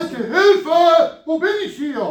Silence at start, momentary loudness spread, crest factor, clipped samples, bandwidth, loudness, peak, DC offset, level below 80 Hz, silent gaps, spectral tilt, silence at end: 0 s; 10 LU; 14 dB; under 0.1%; 14.5 kHz; -16 LUFS; -2 dBFS; under 0.1%; -64 dBFS; none; -4 dB/octave; 0 s